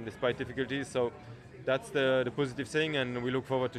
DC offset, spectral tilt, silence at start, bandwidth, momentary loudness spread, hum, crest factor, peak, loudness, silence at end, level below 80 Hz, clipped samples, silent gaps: under 0.1%; -5.5 dB/octave; 0 s; 13 kHz; 7 LU; none; 16 dB; -16 dBFS; -32 LUFS; 0 s; -62 dBFS; under 0.1%; none